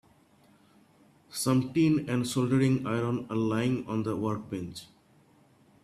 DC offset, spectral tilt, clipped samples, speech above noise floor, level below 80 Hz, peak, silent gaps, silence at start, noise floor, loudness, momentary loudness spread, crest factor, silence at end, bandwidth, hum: under 0.1%; -6.5 dB/octave; under 0.1%; 34 dB; -64 dBFS; -14 dBFS; none; 1.3 s; -62 dBFS; -29 LUFS; 12 LU; 16 dB; 1 s; 15 kHz; none